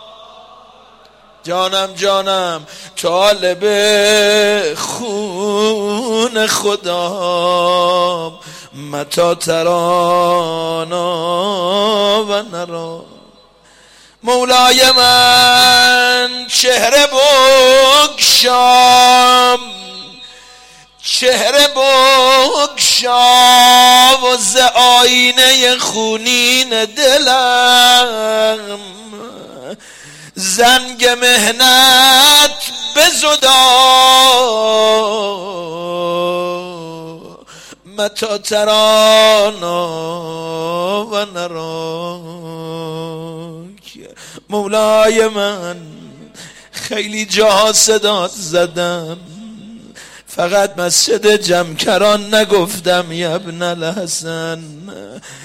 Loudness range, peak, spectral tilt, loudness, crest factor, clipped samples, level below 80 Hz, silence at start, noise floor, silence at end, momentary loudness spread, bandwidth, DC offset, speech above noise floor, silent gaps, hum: 10 LU; 0 dBFS; -1.5 dB/octave; -10 LUFS; 12 dB; under 0.1%; -50 dBFS; 1.45 s; -46 dBFS; 0 s; 18 LU; 16.5 kHz; under 0.1%; 35 dB; none; none